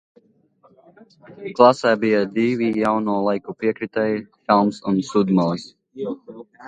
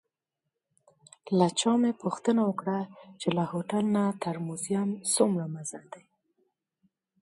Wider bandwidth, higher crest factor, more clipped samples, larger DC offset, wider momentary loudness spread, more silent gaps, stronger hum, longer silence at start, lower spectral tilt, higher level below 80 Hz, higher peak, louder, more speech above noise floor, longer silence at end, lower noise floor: second, 9.2 kHz vs 11.5 kHz; about the same, 20 dB vs 20 dB; neither; neither; first, 16 LU vs 10 LU; neither; neither; about the same, 1.3 s vs 1.25 s; first, -7 dB/octave vs -5 dB/octave; first, -62 dBFS vs -76 dBFS; first, 0 dBFS vs -10 dBFS; first, -20 LUFS vs -28 LUFS; second, 38 dB vs 58 dB; second, 0 s vs 1.25 s; second, -58 dBFS vs -86 dBFS